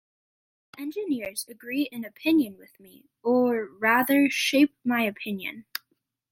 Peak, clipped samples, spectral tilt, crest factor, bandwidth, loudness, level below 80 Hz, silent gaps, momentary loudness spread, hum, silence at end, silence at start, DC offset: -8 dBFS; under 0.1%; -3.5 dB/octave; 18 dB; 16.5 kHz; -25 LUFS; -74 dBFS; none; 14 LU; none; 0.7 s; 0.75 s; under 0.1%